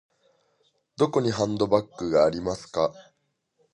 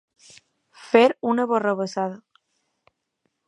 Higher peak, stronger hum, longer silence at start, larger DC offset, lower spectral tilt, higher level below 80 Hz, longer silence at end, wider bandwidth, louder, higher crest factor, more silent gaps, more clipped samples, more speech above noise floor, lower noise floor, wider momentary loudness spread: second, -6 dBFS vs -2 dBFS; neither; first, 1 s vs 0.8 s; neither; about the same, -6 dB/octave vs -5.5 dB/octave; first, -56 dBFS vs -78 dBFS; second, 0.7 s vs 1.3 s; about the same, 11 kHz vs 10.5 kHz; second, -25 LUFS vs -21 LUFS; about the same, 20 dB vs 24 dB; neither; neither; second, 49 dB vs 55 dB; about the same, -73 dBFS vs -75 dBFS; second, 7 LU vs 12 LU